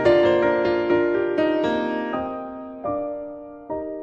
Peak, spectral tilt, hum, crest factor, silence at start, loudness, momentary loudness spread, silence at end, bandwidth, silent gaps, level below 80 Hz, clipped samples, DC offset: -6 dBFS; -7 dB/octave; none; 16 dB; 0 s; -22 LUFS; 15 LU; 0 s; 7.4 kHz; none; -52 dBFS; under 0.1%; under 0.1%